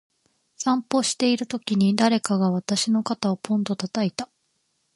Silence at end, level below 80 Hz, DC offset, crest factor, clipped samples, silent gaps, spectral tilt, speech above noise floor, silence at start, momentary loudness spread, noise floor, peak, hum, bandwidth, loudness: 0.7 s; -68 dBFS; under 0.1%; 22 dB; under 0.1%; none; -4.5 dB/octave; 49 dB; 0.6 s; 6 LU; -71 dBFS; -2 dBFS; none; 11.5 kHz; -23 LUFS